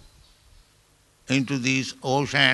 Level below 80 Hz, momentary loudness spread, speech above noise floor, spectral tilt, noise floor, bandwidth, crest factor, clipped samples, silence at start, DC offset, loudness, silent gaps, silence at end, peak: -58 dBFS; 5 LU; 38 dB; -4 dB/octave; -60 dBFS; 12 kHz; 24 dB; under 0.1%; 1.3 s; under 0.1%; -24 LUFS; none; 0 s; -2 dBFS